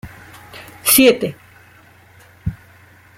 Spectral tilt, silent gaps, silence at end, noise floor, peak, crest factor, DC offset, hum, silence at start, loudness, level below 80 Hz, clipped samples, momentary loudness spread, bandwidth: -3 dB/octave; none; 0.65 s; -47 dBFS; 0 dBFS; 20 dB; under 0.1%; none; 0.05 s; -13 LUFS; -44 dBFS; under 0.1%; 27 LU; 16.5 kHz